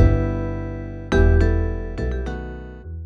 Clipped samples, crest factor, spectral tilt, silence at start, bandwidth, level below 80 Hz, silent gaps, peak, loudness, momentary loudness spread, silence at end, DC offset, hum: under 0.1%; 18 dB; -8.5 dB/octave; 0 s; 6.8 kHz; -24 dBFS; none; -2 dBFS; -22 LUFS; 16 LU; 0 s; under 0.1%; none